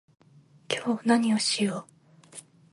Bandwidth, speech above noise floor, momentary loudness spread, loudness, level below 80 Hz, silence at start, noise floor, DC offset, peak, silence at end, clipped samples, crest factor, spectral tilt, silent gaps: 11.5 kHz; 32 dB; 23 LU; -26 LUFS; -76 dBFS; 0.7 s; -57 dBFS; under 0.1%; -10 dBFS; 0.3 s; under 0.1%; 20 dB; -3.5 dB/octave; none